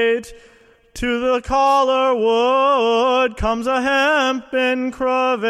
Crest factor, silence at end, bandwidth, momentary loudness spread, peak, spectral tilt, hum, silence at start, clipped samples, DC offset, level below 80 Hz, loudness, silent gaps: 12 dB; 0 s; 13 kHz; 5 LU; -4 dBFS; -4 dB/octave; none; 0 s; under 0.1%; under 0.1%; -40 dBFS; -17 LUFS; none